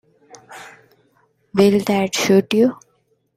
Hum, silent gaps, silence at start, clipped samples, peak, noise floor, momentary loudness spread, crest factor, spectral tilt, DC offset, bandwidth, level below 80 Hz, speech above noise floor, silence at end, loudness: none; none; 0.5 s; under 0.1%; -2 dBFS; -64 dBFS; 23 LU; 18 dB; -5 dB/octave; under 0.1%; 16 kHz; -60 dBFS; 48 dB; 0.6 s; -17 LUFS